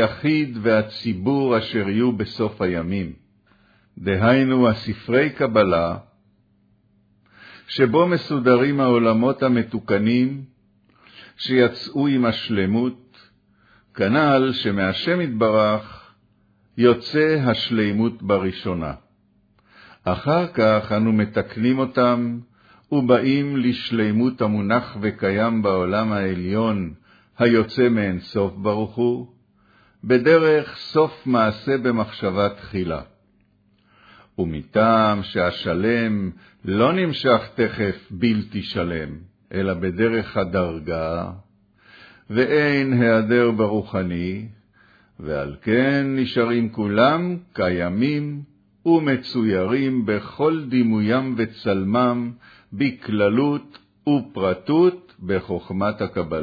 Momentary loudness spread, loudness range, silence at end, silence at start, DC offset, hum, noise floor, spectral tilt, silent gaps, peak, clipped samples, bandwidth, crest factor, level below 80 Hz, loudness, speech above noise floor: 10 LU; 3 LU; 0 s; 0 s; under 0.1%; none; -61 dBFS; -8.5 dB/octave; none; -2 dBFS; under 0.1%; 5 kHz; 18 dB; -52 dBFS; -21 LUFS; 41 dB